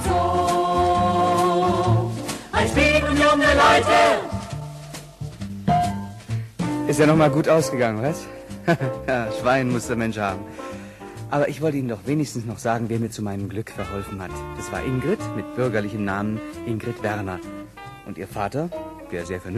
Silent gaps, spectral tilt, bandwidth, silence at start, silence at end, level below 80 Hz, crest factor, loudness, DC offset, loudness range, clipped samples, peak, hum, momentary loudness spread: none; -5.5 dB/octave; 13 kHz; 0 s; 0 s; -42 dBFS; 18 dB; -22 LUFS; under 0.1%; 9 LU; under 0.1%; -4 dBFS; none; 17 LU